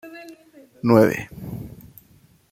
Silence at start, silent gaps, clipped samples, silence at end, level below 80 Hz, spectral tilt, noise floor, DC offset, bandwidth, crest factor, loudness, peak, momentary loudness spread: 0.05 s; none; under 0.1%; 0.85 s; -54 dBFS; -7.5 dB/octave; -55 dBFS; under 0.1%; 16.5 kHz; 22 dB; -19 LUFS; -2 dBFS; 24 LU